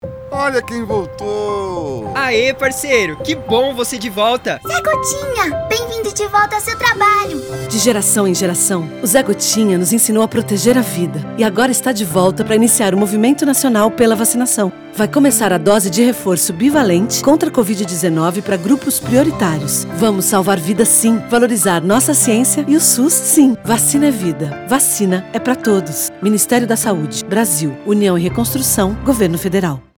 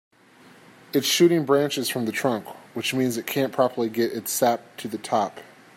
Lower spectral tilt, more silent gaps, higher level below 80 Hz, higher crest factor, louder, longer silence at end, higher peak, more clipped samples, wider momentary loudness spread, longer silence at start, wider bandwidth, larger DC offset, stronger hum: about the same, -4 dB/octave vs -4 dB/octave; neither; first, -44 dBFS vs -72 dBFS; about the same, 14 dB vs 18 dB; first, -14 LUFS vs -24 LUFS; about the same, 0.2 s vs 0.3 s; first, 0 dBFS vs -6 dBFS; neither; second, 8 LU vs 12 LU; second, 0.05 s vs 0.95 s; first, over 20 kHz vs 16 kHz; neither; neither